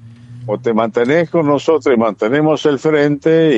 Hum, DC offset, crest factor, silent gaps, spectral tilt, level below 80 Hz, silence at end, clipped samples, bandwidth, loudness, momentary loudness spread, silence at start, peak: none; under 0.1%; 12 dB; none; -7 dB/octave; -56 dBFS; 0 s; under 0.1%; 8 kHz; -14 LUFS; 4 LU; 0.05 s; -2 dBFS